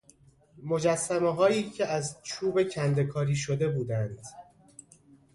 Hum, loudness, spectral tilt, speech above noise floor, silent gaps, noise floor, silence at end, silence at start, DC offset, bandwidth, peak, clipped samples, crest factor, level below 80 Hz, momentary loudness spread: none; -28 LUFS; -5.5 dB/octave; 32 dB; none; -60 dBFS; 0.9 s; 0.55 s; under 0.1%; 11.5 kHz; -12 dBFS; under 0.1%; 18 dB; -62 dBFS; 10 LU